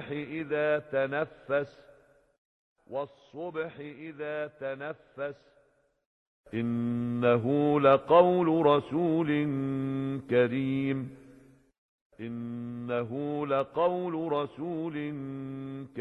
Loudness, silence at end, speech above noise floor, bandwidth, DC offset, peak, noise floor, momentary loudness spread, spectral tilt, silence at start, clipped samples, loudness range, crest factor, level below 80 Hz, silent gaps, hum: -29 LUFS; 0 s; 39 dB; 5.2 kHz; under 0.1%; -8 dBFS; -68 dBFS; 15 LU; -9 dB/octave; 0 s; under 0.1%; 14 LU; 22 dB; -68 dBFS; 2.38-2.76 s, 6.06-6.44 s, 11.78-12.10 s; none